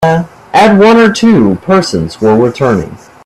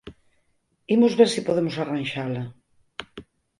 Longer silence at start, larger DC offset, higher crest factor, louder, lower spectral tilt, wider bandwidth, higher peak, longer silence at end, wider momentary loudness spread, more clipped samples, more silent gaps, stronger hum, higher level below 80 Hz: about the same, 0 s vs 0.05 s; neither; second, 8 dB vs 22 dB; first, -8 LUFS vs -22 LUFS; about the same, -6 dB/octave vs -5.5 dB/octave; about the same, 12.5 kHz vs 11.5 kHz; first, 0 dBFS vs -4 dBFS; about the same, 0.3 s vs 0.35 s; second, 10 LU vs 21 LU; first, 0.1% vs under 0.1%; neither; neither; first, -40 dBFS vs -60 dBFS